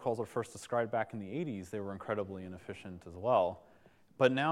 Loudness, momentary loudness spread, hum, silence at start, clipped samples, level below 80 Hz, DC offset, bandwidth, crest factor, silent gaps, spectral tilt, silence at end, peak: -35 LUFS; 16 LU; none; 0 s; under 0.1%; -74 dBFS; under 0.1%; 13.5 kHz; 24 dB; none; -6 dB/octave; 0 s; -12 dBFS